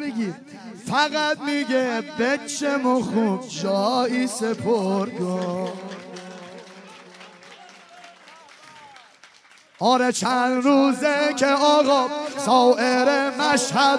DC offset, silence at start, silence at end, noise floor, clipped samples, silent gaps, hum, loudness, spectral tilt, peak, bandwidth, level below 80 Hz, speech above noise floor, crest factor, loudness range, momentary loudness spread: under 0.1%; 0 s; 0 s; -52 dBFS; under 0.1%; none; none; -21 LUFS; -4 dB/octave; -4 dBFS; 11 kHz; -72 dBFS; 32 dB; 18 dB; 14 LU; 19 LU